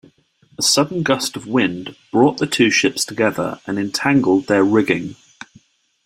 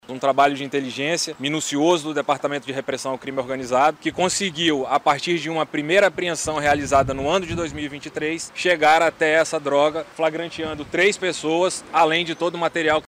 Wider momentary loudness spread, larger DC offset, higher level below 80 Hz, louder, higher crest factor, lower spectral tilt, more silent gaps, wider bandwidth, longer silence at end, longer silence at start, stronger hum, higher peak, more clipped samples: about the same, 8 LU vs 9 LU; neither; second, -56 dBFS vs -50 dBFS; first, -17 LUFS vs -21 LUFS; about the same, 18 dB vs 16 dB; about the same, -4 dB/octave vs -3.5 dB/octave; neither; about the same, 16 kHz vs 16 kHz; first, 0.9 s vs 0.05 s; first, 0.6 s vs 0.1 s; neither; first, 0 dBFS vs -6 dBFS; neither